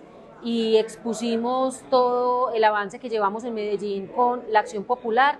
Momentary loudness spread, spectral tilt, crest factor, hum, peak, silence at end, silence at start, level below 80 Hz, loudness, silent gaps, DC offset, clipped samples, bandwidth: 8 LU; -4 dB/octave; 18 dB; none; -4 dBFS; 0 s; 0 s; -66 dBFS; -23 LUFS; none; under 0.1%; under 0.1%; 12 kHz